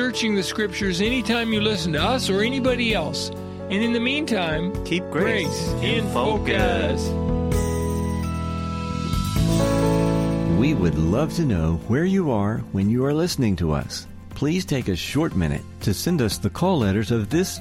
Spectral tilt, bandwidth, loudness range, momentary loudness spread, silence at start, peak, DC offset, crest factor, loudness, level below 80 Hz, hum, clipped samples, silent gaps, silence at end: -5.5 dB/octave; 16.5 kHz; 2 LU; 6 LU; 0 s; -8 dBFS; under 0.1%; 14 dB; -22 LUFS; -36 dBFS; none; under 0.1%; none; 0 s